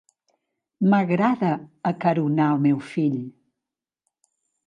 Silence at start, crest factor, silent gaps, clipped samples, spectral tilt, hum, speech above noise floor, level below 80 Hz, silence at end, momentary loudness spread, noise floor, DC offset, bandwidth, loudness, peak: 0.8 s; 18 dB; none; under 0.1%; -9 dB/octave; none; 66 dB; -72 dBFS; 1.35 s; 8 LU; -87 dBFS; under 0.1%; 9.2 kHz; -22 LUFS; -6 dBFS